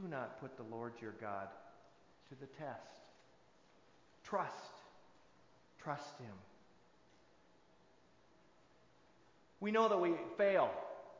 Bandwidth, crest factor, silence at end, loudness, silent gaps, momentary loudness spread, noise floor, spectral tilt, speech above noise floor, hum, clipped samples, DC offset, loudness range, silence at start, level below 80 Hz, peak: 7.6 kHz; 24 dB; 0 s; -40 LUFS; none; 26 LU; -70 dBFS; -6 dB/octave; 30 dB; none; under 0.1%; under 0.1%; 15 LU; 0 s; -82 dBFS; -20 dBFS